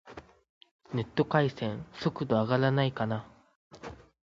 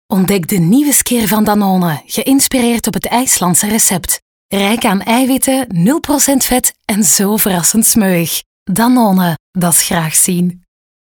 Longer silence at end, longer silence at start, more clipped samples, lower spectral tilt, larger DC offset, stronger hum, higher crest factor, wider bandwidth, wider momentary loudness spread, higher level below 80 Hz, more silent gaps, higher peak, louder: second, 0.3 s vs 0.5 s; about the same, 0.05 s vs 0.1 s; neither; first, -8 dB/octave vs -3.5 dB/octave; neither; neither; first, 22 dB vs 12 dB; second, 7.4 kHz vs over 20 kHz; first, 21 LU vs 7 LU; second, -62 dBFS vs -42 dBFS; second, 0.49-0.61 s, 0.71-0.79 s, 3.55-3.70 s vs 4.22-4.49 s, 8.46-8.66 s, 9.40-9.53 s; second, -10 dBFS vs 0 dBFS; second, -30 LUFS vs -11 LUFS